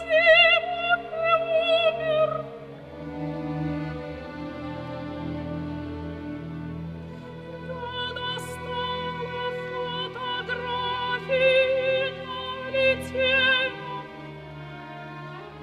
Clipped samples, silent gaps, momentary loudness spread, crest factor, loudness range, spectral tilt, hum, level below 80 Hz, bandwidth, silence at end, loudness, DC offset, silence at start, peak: under 0.1%; none; 19 LU; 20 dB; 11 LU; -5 dB/octave; none; -52 dBFS; 13 kHz; 0 s; -25 LUFS; under 0.1%; 0 s; -6 dBFS